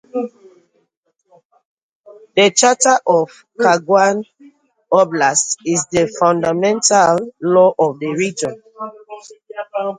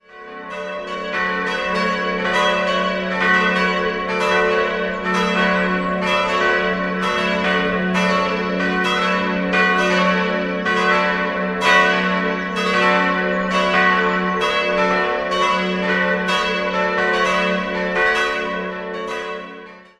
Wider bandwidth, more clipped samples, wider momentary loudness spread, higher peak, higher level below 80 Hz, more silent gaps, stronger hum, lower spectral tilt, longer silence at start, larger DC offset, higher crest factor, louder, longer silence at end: second, 9.8 kHz vs 12 kHz; neither; first, 19 LU vs 9 LU; about the same, 0 dBFS vs -2 dBFS; second, -60 dBFS vs -48 dBFS; first, 0.97-1.03 s, 1.45-1.50 s, 1.65-1.77 s, 1.83-2.04 s vs none; neither; second, -3 dB/octave vs -4.5 dB/octave; about the same, 0.15 s vs 0.1 s; neither; about the same, 16 dB vs 18 dB; first, -15 LUFS vs -18 LUFS; second, 0.05 s vs 0.2 s